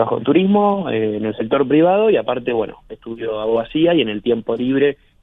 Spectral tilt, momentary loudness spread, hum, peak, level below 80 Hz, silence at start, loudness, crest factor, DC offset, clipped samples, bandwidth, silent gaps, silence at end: -9.5 dB/octave; 10 LU; none; -2 dBFS; -52 dBFS; 0 s; -17 LUFS; 16 dB; under 0.1%; under 0.1%; 4 kHz; none; 0.3 s